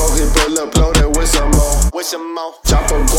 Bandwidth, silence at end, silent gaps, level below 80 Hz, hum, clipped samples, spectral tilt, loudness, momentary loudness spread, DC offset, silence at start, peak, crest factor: 17 kHz; 0 s; none; -14 dBFS; none; under 0.1%; -4 dB/octave; -15 LUFS; 8 LU; under 0.1%; 0 s; 0 dBFS; 12 dB